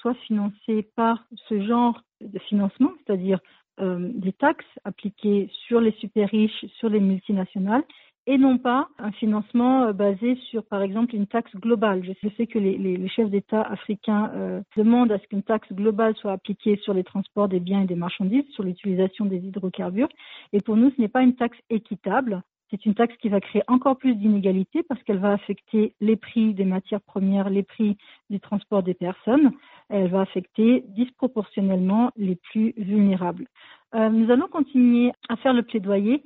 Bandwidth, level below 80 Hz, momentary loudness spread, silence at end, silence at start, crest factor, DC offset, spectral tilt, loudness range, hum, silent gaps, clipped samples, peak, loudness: 4.1 kHz; -66 dBFS; 9 LU; 0.05 s; 0.05 s; 16 dB; under 0.1%; -6.5 dB/octave; 3 LU; none; 8.18-8.25 s; under 0.1%; -6 dBFS; -23 LUFS